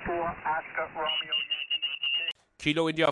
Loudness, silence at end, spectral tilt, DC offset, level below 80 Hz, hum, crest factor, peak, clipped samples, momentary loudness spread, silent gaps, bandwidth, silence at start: -29 LUFS; 0 s; -4.5 dB/octave; under 0.1%; -58 dBFS; none; 18 dB; -12 dBFS; under 0.1%; 5 LU; none; 11.5 kHz; 0 s